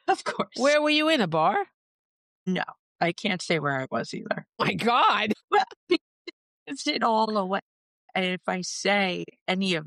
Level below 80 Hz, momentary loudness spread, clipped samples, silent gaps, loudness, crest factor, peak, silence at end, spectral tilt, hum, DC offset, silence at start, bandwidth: -74 dBFS; 12 LU; under 0.1%; 1.74-2.46 s, 2.79-2.96 s, 5.44-5.48 s, 5.76-5.87 s, 6.01-6.25 s, 6.33-6.66 s, 7.62-8.08 s, 9.41-9.46 s; -25 LUFS; 16 dB; -10 dBFS; 0 s; -4 dB/octave; none; under 0.1%; 0.05 s; 13 kHz